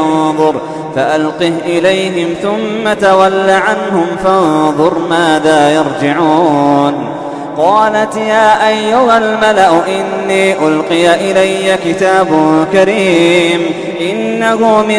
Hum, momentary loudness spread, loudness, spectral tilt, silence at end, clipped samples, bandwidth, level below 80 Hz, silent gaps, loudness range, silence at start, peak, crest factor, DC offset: none; 6 LU; -10 LUFS; -5 dB/octave; 0 s; 0.2%; 11 kHz; -48 dBFS; none; 2 LU; 0 s; 0 dBFS; 10 dB; under 0.1%